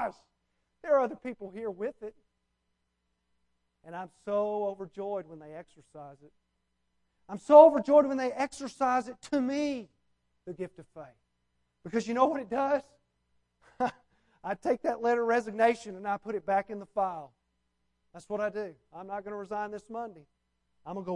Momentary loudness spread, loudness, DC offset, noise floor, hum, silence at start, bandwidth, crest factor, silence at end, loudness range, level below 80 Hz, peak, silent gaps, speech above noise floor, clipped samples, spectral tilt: 21 LU; -29 LUFS; under 0.1%; -80 dBFS; none; 0 s; 11 kHz; 26 dB; 0 s; 14 LU; -72 dBFS; -6 dBFS; none; 50 dB; under 0.1%; -5.5 dB/octave